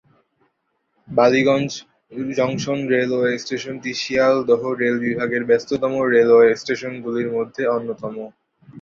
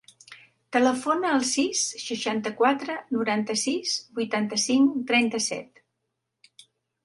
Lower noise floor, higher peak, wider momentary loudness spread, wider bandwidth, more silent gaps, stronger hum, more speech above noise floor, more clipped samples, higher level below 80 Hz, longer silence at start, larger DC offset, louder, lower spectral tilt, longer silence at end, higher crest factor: second, -71 dBFS vs -80 dBFS; first, -2 dBFS vs -8 dBFS; first, 14 LU vs 7 LU; second, 7.2 kHz vs 11.5 kHz; neither; neither; second, 52 dB vs 56 dB; neither; first, -62 dBFS vs -74 dBFS; first, 1.1 s vs 0.3 s; neither; first, -19 LUFS vs -25 LUFS; first, -5.5 dB/octave vs -2.5 dB/octave; second, 0 s vs 1.4 s; about the same, 18 dB vs 20 dB